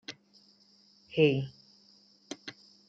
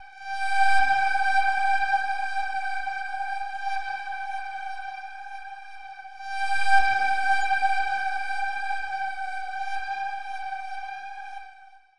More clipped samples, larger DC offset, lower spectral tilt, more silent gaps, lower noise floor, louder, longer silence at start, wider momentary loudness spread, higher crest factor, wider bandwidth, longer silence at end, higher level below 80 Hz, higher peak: neither; second, under 0.1% vs 2%; first, -6.5 dB/octave vs -1 dB/octave; neither; first, -63 dBFS vs -51 dBFS; second, -30 LUFS vs -27 LUFS; about the same, 0.1 s vs 0 s; first, 21 LU vs 17 LU; first, 24 dB vs 18 dB; second, 7.8 kHz vs 11 kHz; first, 0.35 s vs 0 s; second, -74 dBFS vs -58 dBFS; second, -12 dBFS vs -8 dBFS